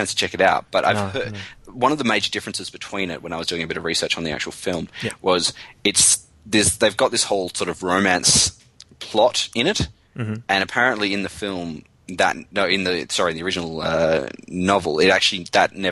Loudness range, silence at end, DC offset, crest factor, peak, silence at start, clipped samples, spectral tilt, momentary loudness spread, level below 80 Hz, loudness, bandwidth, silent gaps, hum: 5 LU; 0 s; under 0.1%; 18 dB; -2 dBFS; 0 s; under 0.1%; -2.5 dB/octave; 13 LU; -46 dBFS; -20 LUFS; 12.5 kHz; none; none